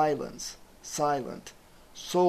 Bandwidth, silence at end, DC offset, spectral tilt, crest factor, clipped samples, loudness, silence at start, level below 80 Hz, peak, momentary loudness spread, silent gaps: 14 kHz; 0 s; under 0.1%; -4.5 dB/octave; 18 dB; under 0.1%; -32 LUFS; 0 s; -58 dBFS; -12 dBFS; 18 LU; none